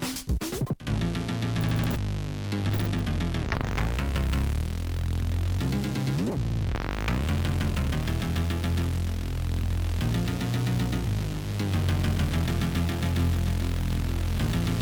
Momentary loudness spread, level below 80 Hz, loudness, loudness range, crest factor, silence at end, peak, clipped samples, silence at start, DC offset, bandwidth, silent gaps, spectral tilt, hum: 4 LU; -32 dBFS; -28 LUFS; 1 LU; 16 dB; 0 s; -10 dBFS; under 0.1%; 0 s; under 0.1%; over 20 kHz; none; -6 dB/octave; none